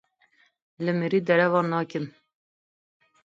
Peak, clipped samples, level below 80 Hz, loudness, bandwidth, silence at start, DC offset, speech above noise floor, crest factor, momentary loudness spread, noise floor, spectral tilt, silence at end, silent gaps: -8 dBFS; under 0.1%; -76 dBFS; -25 LUFS; 7.4 kHz; 0.8 s; under 0.1%; 41 dB; 20 dB; 12 LU; -65 dBFS; -8 dB/octave; 1.15 s; none